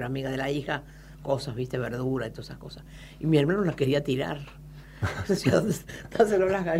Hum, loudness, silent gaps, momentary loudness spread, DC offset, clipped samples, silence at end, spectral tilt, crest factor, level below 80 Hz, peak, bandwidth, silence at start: none; -27 LUFS; none; 20 LU; under 0.1%; under 0.1%; 0 s; -6.5 dB/octave; 18 dB; -50 dBFS; -8 dBFS; 16 kHz; 0 s